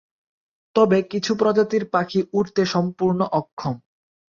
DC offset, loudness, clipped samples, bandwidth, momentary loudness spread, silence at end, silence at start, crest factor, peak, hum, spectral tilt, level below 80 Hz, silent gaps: under 0.1%; -21 LUFS; under 0.1%; 7.4 kHz; 10 LU; 0.55 s; 0.75 s; 18 dB; -4 dBFS; none; -6.5 dB/octave; -62 dBFS; 3.52-3.57 s